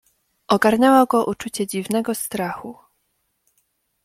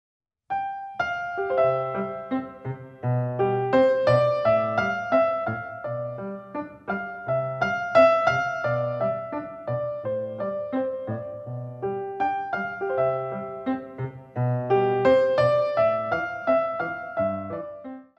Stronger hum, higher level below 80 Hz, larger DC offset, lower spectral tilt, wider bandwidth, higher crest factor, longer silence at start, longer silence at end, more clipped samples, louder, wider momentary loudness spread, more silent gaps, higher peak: neither; about the same, -60 dBFS vs -60 dBFS; neither; second, -4.5 dB/octave vs -7.5 dB/octave; first, 16.5 kHz vs 8.2 kHz; about the same, 18 dB vs 20 dB; about the same, 0.5 s vs 0.5 s; first, 1.3 s vs 0.15 s; neither; first, -19 LUFS vs -25 LUFS; about the same, 13 LU vs 14 LU; neither; first, -2 dBFS vs -6 dBFS